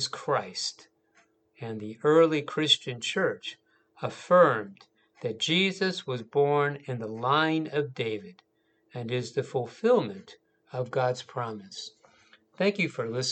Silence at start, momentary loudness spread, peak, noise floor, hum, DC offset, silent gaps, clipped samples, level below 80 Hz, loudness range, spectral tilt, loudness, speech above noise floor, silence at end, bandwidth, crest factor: 0 s; 16 LU; -8 dBFS; -66 dBFS; none; under 0.1%; none; under 0.1%; -80 dBFS; 6 LU; -4.5 dB/octave; -27 LUFS; 38 dB; 0 s; 9 kHz; 22 dB